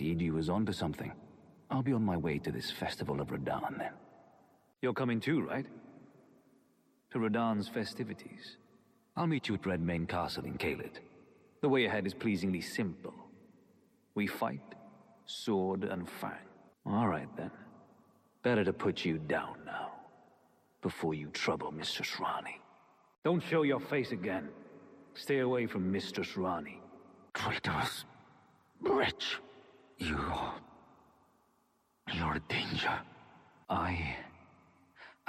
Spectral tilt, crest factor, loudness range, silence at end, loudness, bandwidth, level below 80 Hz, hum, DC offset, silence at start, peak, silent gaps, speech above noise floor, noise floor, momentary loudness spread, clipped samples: -6 dB/octave; 18 dB; 4 LU; 0.15 s; -36 LUFS; 15.5 kHz; -62 dBFS; none; under 0.1%; 0 s; -18 dBFS; 23.18-23.22 s; 39 dB; -74 dBFS; 18 LU; under 0.1%